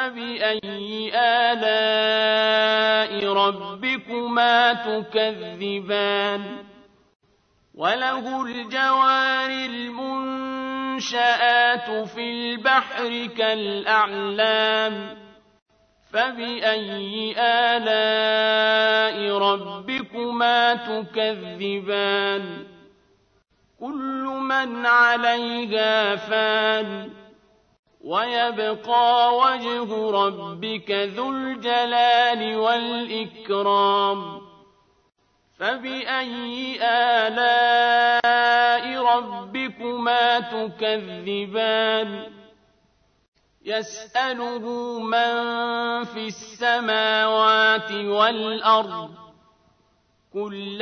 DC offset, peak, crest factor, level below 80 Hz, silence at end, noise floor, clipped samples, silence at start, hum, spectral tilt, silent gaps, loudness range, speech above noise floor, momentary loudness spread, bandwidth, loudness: under 0.1%; -4 dBFS; 18 dB; -70 dBFS; 0 s; -64 dBFS; under 0.1%; 0 s; none; -3.5 dB/octave; 7.15-7.20 s, 15.62-15.66 s, 27.79-27.83 s, 43.28-43.32 s; 6 LU; 42 dB; 12 LU; 6.6 kHz; -21 LUFS